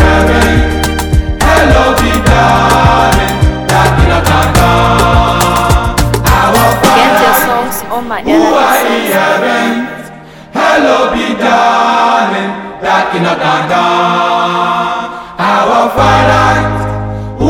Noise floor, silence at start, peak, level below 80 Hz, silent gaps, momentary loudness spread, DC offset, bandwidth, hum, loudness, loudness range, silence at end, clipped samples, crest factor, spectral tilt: -30 dBFS; 0 s; 0 dBFS; -18 dBFS; none; 9 LU; under 0.1%; 19.5 kHz; none; -9 LUFS; 3 LU; 0 s; under 0.1%; 8 dB; -5 dB/octave